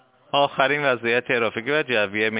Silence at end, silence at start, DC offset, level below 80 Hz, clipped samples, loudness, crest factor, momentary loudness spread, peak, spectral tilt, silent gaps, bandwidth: 0 s; 0.35 s; under 0.1%; -66 dBFS; under 0.1%; -21 LUFS; 18 dB; 3 LU; -4 dBFS; -8 dB/octave; none; 4 kHz